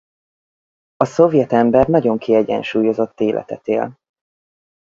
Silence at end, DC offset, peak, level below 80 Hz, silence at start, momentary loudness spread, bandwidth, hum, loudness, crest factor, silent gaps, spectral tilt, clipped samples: 0.95 s; under 0.1%; 0 dBFS; -48 dBFS; 1 s; 8 LU; 7.6 kHz; none; -16 LUFS; 18 dB; none; -7.5 dB/octave; under 0.1%